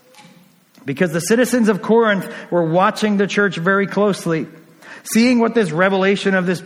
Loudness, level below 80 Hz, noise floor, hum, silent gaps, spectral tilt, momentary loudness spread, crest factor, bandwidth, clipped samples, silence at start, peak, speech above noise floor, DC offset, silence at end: -16 LUFS; -62 dBFS; -49 dBFS; none; none; -5.5 dB/octave; 7 LU; 16 dB; 16.5 kHz; under 0.1%; 0.85 s; -2 dBFS; 33 dB; under 0.1%; 0 s